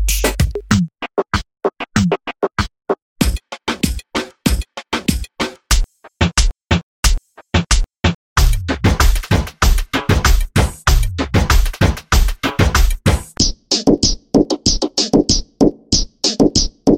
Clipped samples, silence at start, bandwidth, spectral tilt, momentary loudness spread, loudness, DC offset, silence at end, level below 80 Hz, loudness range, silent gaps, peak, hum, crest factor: under 0.1%; 0 s; 17 kHz; -4 dB/octave; 8 LU; -17 LUFS; under 0.1%; 0 s; -20 dBFS; 5 LU; 3.02-3.16 s, 6.83-7.03 s, 8.15-8.36 s; 0 dBFS; none; 16 dB